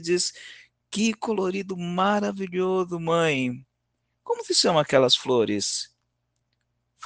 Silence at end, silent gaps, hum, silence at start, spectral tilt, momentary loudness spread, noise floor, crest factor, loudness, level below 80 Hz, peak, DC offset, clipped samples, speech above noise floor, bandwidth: 0 s; none; 60 Hz at -60 dBFS; 0 s; -3.5 dB/octave; 12 LU; -76 dBFS; 20 dB; -24 LUFS; -68 dBFS; -4 dBFS; under 0.1%; under 0.1%; 52 dB; 10 kHz